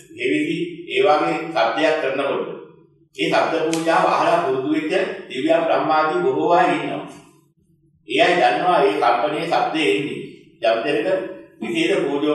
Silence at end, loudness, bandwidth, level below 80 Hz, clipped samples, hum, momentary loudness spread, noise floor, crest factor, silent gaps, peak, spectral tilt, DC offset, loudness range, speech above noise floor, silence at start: 0 s; -19 LUFS; 12.5 kHz; -72 dBFS; under 0.1%; none; 10 LU; -59 dBFS; 18 dB; none; -2 dBFS; -4.5 dB/octave; under 0.1%; 2 LU; 40 dB; 0.1 s